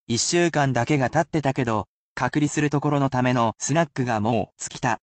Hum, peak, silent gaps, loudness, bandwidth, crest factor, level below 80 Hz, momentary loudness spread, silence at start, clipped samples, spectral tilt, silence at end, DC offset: none; -8 dBFS; 1.88-2.16 s; -23 LUFS; 9.2 kHz; 16 dB; -54 dBFS; 6 LU; 0.1 s; under 0.1%; -5 dB/octave; 0.05 s; under 0.1%